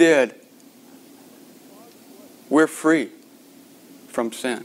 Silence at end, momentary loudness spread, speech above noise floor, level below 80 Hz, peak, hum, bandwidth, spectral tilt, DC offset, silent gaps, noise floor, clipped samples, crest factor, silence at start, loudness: 0 s; 11 LU; 30 dB; -78 dBFS; -4 dBFS; none; 16 kHz; -4 dB/octave; under 0.1%; none; -49 dBFS; under 0.1%; 20 dB; 0 s; -21 LUFS